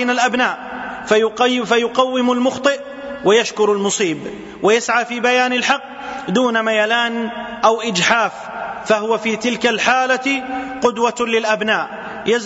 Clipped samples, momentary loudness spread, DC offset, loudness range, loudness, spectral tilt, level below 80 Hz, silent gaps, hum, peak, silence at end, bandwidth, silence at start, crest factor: under 0.1%; 11 LU; under 0.1%; 1 LU; -17 LUFS; -3 dB/octave; -56 dBFS; none; none; 0 dBFS; 0 s; 8 kHz; 0 s; 16 dB